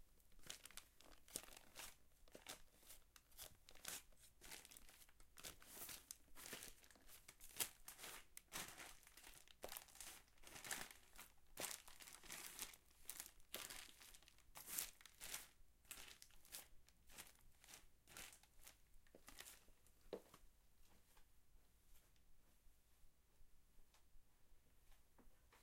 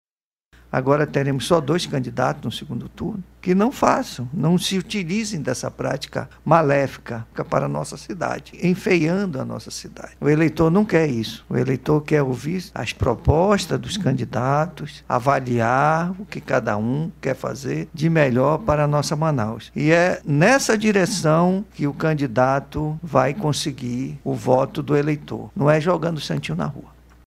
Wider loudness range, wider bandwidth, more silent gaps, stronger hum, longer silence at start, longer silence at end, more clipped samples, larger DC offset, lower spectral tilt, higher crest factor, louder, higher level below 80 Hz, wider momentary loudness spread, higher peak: first, 9 LU vs 4 LU; about the same, 16.5 kHz vs 15 kHz; neither; neither; second, 0 s vs 0.7 s; second, 0 s vs 0.4 s; neither; neither; second, -0.5 dB/octave vs -6 dB/octave; first, 38 dB vs 20 dB; second, -56 LUFS vs -21 LUFS; second, -72 dBFS vs -44 dBFS; first, 14 LU vs 11 LU; second, -22 dBFS vs 0 dBFS